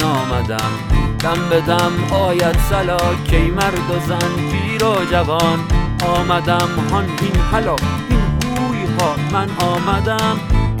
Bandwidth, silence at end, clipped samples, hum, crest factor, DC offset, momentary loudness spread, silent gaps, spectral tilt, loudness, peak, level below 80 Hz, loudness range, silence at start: 18.5 kHz; 0 s; under 0.1%; none; 14 dB; under 0.1%; 4 LU; none; -5.5 dB/octave; -17 LUFS; 0 dBFS; -24 dBFS; 1 LU; 0 s